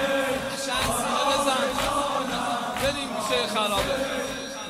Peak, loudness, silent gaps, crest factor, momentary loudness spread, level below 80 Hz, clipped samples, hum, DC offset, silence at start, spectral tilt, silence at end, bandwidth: -10 dBFS; -25 LUFS; none; 16 dB; 5 LU; -48 dBFS; under 0.1%; none; under 0.1%; 0 s; -2.5 dB/octave; 0 s; 16 kHz